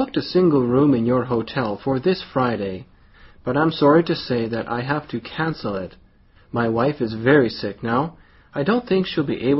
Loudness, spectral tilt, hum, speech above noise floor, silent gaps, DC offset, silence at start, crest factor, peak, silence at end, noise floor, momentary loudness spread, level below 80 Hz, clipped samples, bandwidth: -21 LUFS; -5.5 dB/octave; none; 32 dB; none; under 0.1%; 0 s; 18 dB; -2 dBFS; 0 s; -52 dBFS; 12 LU; -50 dBFS; under 0.1%; 6 kHz